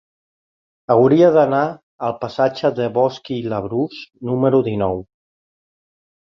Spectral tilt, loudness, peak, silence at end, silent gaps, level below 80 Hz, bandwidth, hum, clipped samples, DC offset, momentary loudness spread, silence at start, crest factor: -8 dB/octave; -18 LUFS; -2 dBFS; 1.3 s; 1.83-1.99 s; -54 dBFS; 6.8 kHz; none; under 0.1%; under 0.1%; 14 LU; 0.9 s; 18 dB